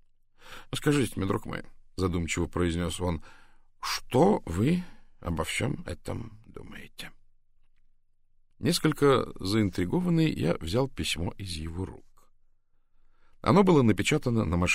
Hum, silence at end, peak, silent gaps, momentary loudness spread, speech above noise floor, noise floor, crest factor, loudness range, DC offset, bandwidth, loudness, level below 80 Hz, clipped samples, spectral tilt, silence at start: none; 0 s; -8 dBFS; none; 20 LU; 35 dB; -62 dBFS; 20 dB; 8 LU; under 0.1%; 16 kHz; -28 LUFS; -46 dBFS; under 0.1%; -5.5 dB/octave; 0.45 s